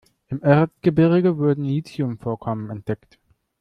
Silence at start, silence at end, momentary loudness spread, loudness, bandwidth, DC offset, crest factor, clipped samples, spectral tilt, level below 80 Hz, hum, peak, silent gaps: 0.3 s; 0.65 s; 13 LU; -21 LUFS; 8.6 kHz; under 0.1%; 18 dB; under 0.1%; -9.5 dB/octave; -54 dBFS; none; -2 dBFS; none